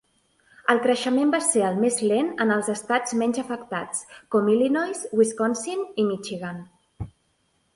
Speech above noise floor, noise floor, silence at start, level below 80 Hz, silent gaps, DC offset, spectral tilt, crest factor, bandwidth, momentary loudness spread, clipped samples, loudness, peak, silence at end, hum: 45 dB; -68 dBFS; 0.7 s; -58 dBFS; none; under 0.1%; -4 dB/octave; 20 dB; 11.5 kHz; 12 LU; under 0.1%; -24 LUFS; -4 dBFS; 0.65 s; none